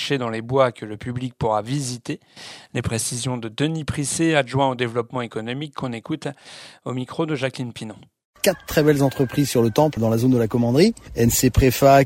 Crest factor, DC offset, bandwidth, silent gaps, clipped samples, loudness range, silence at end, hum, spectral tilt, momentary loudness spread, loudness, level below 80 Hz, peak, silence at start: 20 dB; under 0.1%; 16.5 kHz; 8.25-8.34 s; under 0.1%; 8 LU; 0 s; none; -5 dB/octave; 14 LU; -21 LUFS; -40 dBFS; -2 dBFS; 0 s